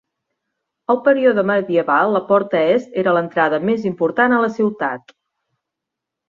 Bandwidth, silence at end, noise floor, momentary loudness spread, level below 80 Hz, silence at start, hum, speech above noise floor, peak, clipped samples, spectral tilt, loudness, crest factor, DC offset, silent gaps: 7.2 kHz; 1.3 s; -82 dBFS; 6 LU; -64 dBFS; 0.9 s; none; 66 dB; -2 dBFS; under 0.1%; -7.5 dB/octave; -17 LUFS; 16 dB; under 0.1%; none